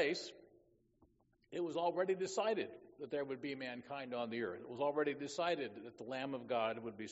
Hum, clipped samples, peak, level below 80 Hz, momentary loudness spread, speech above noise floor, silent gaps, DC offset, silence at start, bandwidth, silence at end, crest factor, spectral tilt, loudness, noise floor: none; under 0.1%; -22 dBFS; -82 dBFS; 10 LU; 33 dB; none; under 0.1%; 0 s; 8 kHz; 0 s; 20 dB; -3 dB/octave; -41 LUFS; -73 dBFS